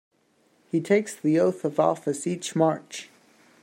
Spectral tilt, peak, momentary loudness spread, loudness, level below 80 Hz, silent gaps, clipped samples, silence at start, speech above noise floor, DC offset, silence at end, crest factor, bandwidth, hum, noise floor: -5.5 dB/octave; -8 dBFS; 9 LU; -25 LUFS; -76 dBFS; none; under 0.1%; 0.75 s; 41 dB; under 0.1%; 0.55 s; 18 dB; 16 kHz; none; -65 dBFS